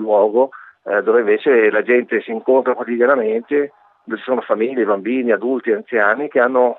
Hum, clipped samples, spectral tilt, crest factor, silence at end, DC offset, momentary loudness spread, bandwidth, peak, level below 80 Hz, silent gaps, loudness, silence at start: none; under 0.1%; -8 dB/octave; 16 dB; 0.05 s; under 0.1%; 7 LU; 4.1 kHz; -2 dBFS; -84 dBFS; none; -17 LUFS; 0 s